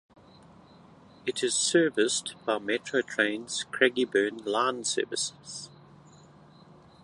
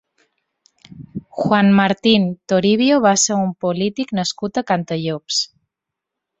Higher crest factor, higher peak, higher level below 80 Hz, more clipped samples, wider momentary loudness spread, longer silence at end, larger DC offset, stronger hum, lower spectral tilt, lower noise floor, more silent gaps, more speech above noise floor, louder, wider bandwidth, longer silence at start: about the same, 22 dB vs 18 dB; second, -8 dBFS vs -2 dBFS; second, -72 dBFS vs -58 dBFS; neither; about the same, 11 LU vs 10 LU; first, 1.35 s vs 0.95 s; neither; neither; second, -2 dB/octave vs -4 dB/octave; second, -54 dBFS vs -83 dBFS; neither; second, 26 dB vs 66 dB; second, -28 LUFS vs -17 LUFS; first, 11.5 kHz vs 8.2 kHz; first, 1.25 s vs 0.9 s